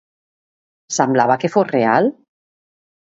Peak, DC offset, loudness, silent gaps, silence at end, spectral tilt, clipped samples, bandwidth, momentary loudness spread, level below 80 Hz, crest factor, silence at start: 0 dBFS; under 0.1%; -17 LUFS; none; 0.95 s; -5 dB/octave; under 0.1%; 8 kHz; 6 LU; -66 dBFS; 18 dB; 0.9 s